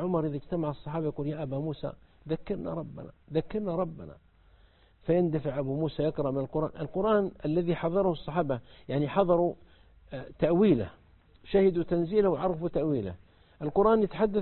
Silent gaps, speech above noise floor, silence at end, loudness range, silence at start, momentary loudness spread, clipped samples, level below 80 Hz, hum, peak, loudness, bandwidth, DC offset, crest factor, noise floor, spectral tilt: none; 32 dB; 0 s; 7 LU; 0 s; 15 LU; under 0.1%; -54 dBFS; none; -10 dBFS; -29 LUFS; 4.3 kHz; under 0.1%; 18 dB; -60 dBFS; -11.5 dB/octave